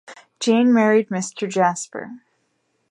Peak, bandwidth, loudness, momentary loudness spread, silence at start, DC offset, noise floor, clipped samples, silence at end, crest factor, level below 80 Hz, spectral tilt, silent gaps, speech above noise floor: -4 dBFS; 11 kHz; -19 LUFS; 17 LU; 0.1 s; under 0.1%; -69 dBFS; under 0.1%; 0.75 s; 16 dB; -74 dBFS; -5 dB/octave; none; 50 dB